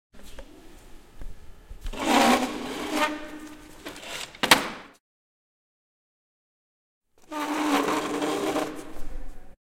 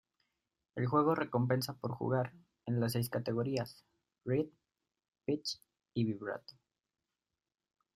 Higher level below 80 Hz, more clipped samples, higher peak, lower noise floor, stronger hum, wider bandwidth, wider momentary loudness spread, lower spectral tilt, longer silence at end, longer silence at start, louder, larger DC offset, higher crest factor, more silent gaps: first, -46 dBFS vs -72 dBFS; neither; first, 0 dBFS vs -16 dBFS; second, -47 dBFS vs under -90 dBFS; neither; about the same, 16.5 kHz vs 15.5 kHz; first, 24 LU vs 14 LU; second, -2.5 dB/octave vs -6.5 dB/octave; second, 0.15 s vs 1.45 s; second, 0.15 s vs 0.75 s; first, -25 LUFS vs -36 LUFS; neither; first, 28 dB vs 22 dB; first, 5.00-7.01 s vs none